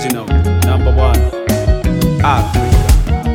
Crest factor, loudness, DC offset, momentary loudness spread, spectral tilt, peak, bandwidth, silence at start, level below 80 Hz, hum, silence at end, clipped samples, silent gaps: 12 dB; -13 LUFS; under 0.1%; 3 LU; -6.5 dB/octave; 0 dBFS; 17 kHz; 0 s; -14 dBFS; none; 0 s; under 0.1%; none